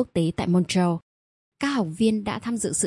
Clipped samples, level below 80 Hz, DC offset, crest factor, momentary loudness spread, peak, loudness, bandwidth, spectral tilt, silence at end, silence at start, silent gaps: under 0.1%; -54 dBFS; under 0.1%; 16 dB; 6 LU; -8 dBFS; -24 LUFS; 11.5 kHz; -5 dB/octave; 0 s; 0 s; 1.02-1.52 s